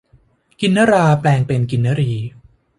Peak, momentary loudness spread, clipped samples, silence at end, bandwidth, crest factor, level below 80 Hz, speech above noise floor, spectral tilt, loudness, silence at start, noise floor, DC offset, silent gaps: -2 dBFS; 9 LU; under 0.1%; 0.5 s; 11.5 kHz; 14 dB; -48 dBFS; 39 dB; -7 dB/octave; -16 LUFS; 0.6 s; -54 dBFS; under 0.1%; none